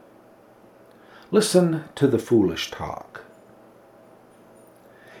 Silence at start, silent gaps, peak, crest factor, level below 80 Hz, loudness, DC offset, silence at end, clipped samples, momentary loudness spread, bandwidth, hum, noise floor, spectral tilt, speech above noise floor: 1.3 s; none; -4 dBFS; 22 dB; -58 dBFS; -22 LUFS; under 0.1%; 2 s; under 0.1%; 18 LU; 16.5 kHz; none; -52 dBFS; -5.5 dB/octave; 30 dB